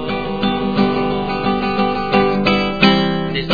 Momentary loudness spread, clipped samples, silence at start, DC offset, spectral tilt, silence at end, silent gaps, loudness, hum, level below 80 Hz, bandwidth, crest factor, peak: 6 LU; under 0.1%; 0 s; 2%; -7 dB/octave; 0 s; none; -16 LUFS; none; -38 dBFS; 5.4 kHz; 16 dB; 0 dBFS